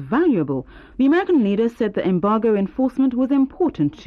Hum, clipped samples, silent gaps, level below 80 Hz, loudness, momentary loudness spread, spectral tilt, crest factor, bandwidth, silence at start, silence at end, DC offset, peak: none; under 0.1%; none; -50 dBFS; -19 LUFS; 5 LU; -9 dB/octave; 10 dB; 5.2 kHz; 0 s; 0.05 s; under 0.1%; -10 dBFS